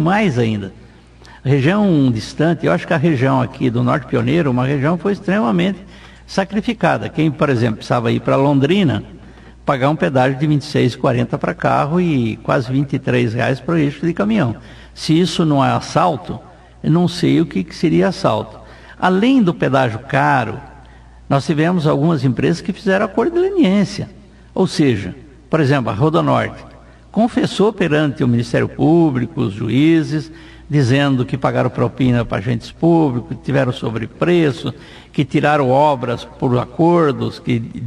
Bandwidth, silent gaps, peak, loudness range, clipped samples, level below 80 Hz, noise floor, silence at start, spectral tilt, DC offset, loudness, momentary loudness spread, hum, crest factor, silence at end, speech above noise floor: 11.5 kHz; none; -2 dBFS; 2 LU; under 0.1%; -44 dBFS; -42 dBFS; 0 s; -7 dB/octave; under 0.1%; -16 LUFS; 9 LU; none; 14 dB; 0 s; 26 dB